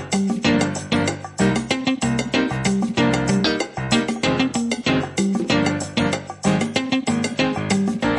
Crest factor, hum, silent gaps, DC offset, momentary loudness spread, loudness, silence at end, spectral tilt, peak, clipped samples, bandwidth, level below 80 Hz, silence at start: 16 dB; none; none; under 0.1%; 3 LU; -21 LUFS; 0 s; -5 dB/octave; -4 dBFS; under 0.1%; 11.5 kHz; -46 dBFS; 0 s